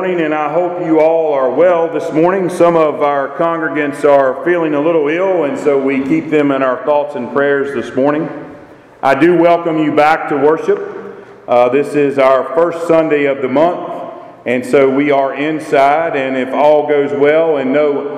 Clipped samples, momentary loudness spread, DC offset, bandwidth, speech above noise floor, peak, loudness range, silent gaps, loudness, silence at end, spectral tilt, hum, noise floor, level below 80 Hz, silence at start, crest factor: under 0.1%; 7 LU; under 0.1%; 12 kHz; 25 dB; 0 dBFS; 2 LU; none; -13 LUFS; 0 s; -6.5 dB/octave; none; -37 dBFS; -58 dBFS; 0 s; 12 dB